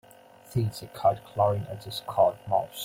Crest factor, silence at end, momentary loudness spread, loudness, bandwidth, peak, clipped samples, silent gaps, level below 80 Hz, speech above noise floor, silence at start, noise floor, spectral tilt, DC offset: 20 dB; 0 s; 9 LU; -28 LUFS; 16.5 kHz; -8 dBFS; under 0.1%; none; -60 dBFS; 25 dB; 0.5 s; -52 dBFS; -6 dB/octave; under 0.1%